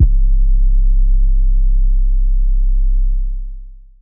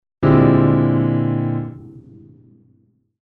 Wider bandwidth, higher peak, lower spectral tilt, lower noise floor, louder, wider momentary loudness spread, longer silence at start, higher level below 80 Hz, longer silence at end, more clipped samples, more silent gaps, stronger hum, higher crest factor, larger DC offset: second, 0.4 kHz vs 4.3 kHz; about the same, -2 dBFS vs -2 dBFS; first, -14.5 dB/octave vs -12 dB/octave; second, -31 dBFS vs -59 dBFS; about the same, -18 LUFS vs -16 LUFS; second, 8 LU vs 12 LU; second, 0 s vs 0.2 s; first, -12 dBFS vs -42 dBFS; second, 0.3 s vs 1.2 s; neither; neither; neither; second, 10 dB vs 16 dB; neither